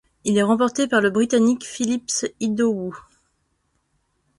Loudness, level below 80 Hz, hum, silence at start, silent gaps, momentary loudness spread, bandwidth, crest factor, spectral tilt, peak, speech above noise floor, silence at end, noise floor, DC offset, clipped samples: -21 LUFS; -60 dBFS; none; 0.25 s; none; 7 LU; 11.5 kHz; 16 dB; -4 dB/octave; -6 dBFS; 50 dB; 1.4 s; -70 dBFS; under 0.1%; under 0.1%